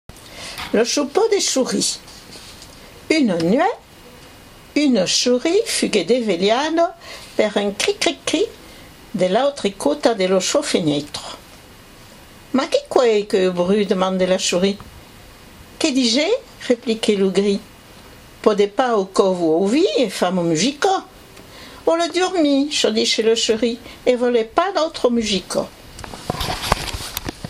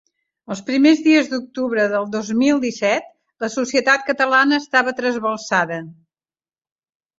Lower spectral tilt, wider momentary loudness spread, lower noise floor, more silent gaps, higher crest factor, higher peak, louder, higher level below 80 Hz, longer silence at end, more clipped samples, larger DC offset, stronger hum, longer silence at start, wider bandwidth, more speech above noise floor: about the same, -3.5 dB/octave vs -4 dB/octave; first, 13 LU vs 10 LU; second, -43 dBFS vs under -90 dBFS; neither; about the same, 20 dB vs 18 dB; about the same, 0 dBFS vs -2 dBFS; about the same, -18 LUFS vs -18 LUFS; first, -46 dBFS vs -64 dBFS; second, 0 s vs 1.25 s; neither; neither; neither; second, 0.15 s vs 0.5 s; first, 16 kHz vs 7.8 kHz; second, 25 dB vs over 72 dB